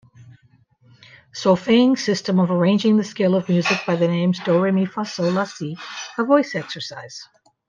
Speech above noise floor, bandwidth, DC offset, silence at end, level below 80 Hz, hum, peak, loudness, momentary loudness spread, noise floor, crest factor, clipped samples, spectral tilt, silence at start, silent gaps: 38 dB; 7.4 kHz; under 0.1%; 0.45 s; -66 dBFS; none; -4 dBFS; -20 LUFS; 14 LU; -57 dBFS; 16 dB; under 0.1%; -6 dB/octave; 0.2 s; none